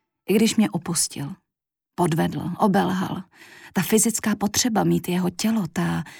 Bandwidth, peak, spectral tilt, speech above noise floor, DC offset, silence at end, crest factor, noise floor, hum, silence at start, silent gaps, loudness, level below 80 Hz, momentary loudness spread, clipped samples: 19.5 kHz; -6 dBFS; -4.5 dB/octave; 64 dB; under 0.1%; 0 s; 16 dB; -86 dBFS; none; 0.3 s; none; -22 LUFS; -58 dBFS; 10 LU; under 0.1%